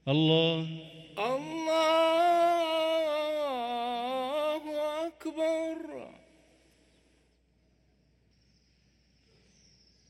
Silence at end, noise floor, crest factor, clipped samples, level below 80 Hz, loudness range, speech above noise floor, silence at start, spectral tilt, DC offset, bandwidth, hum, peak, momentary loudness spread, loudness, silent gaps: 4 s; -68 dBFS; 20 dB; under 0.1%; -72 dBFS; 11 LU; 41 dB; 0.05 s; -5.5 dB/octave; under 0.1%; 14.5 kHz; none; -12 dBFS; 15 LU; -29 LUFS; none